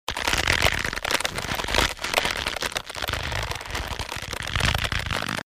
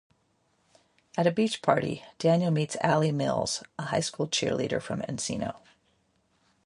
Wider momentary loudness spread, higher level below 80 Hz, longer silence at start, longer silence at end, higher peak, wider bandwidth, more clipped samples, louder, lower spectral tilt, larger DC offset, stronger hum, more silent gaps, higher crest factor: about the same, 9 LU vs 8 LU; first, -36 dBFS vs -62 dBFS; second, 0.1 s vs 1.15 s; second, 0.05 s vs 1.1 s; first, -2 dBFS vs -6 dBFS; first, 16 kHz vs 11.5 kHz; neither; first, -25 LUFS vs -28 LUFS; second, -2.5 dB/octave vs -5 dB/octave; neither; neither; neither; about the same, 24 dB vs 24 dB